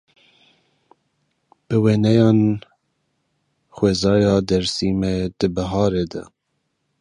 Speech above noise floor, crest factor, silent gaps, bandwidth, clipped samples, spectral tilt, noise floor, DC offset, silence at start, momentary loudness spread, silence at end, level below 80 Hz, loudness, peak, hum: 55 dB; 18 dB; none; 11 kHz; under 0.1%; -6.5 dB/octave; -73 dBFS; under 0.1%; 1.7 s; 8 LU; 0.75 s; -44 dBFS; -19 LUFS; -2 dBFS; none